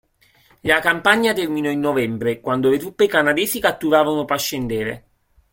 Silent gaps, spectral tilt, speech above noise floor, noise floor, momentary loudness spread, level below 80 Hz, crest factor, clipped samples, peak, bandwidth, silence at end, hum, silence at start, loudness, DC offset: none; -4 dB/octave; 38 dB; -56 dBFS; 8 LU; -52 dBFS; 18 dB; under 0.1%; 0 dBFS; 17 kHz; 0.55 s; none; 0.65 s; -19 LUFS; under 0.1%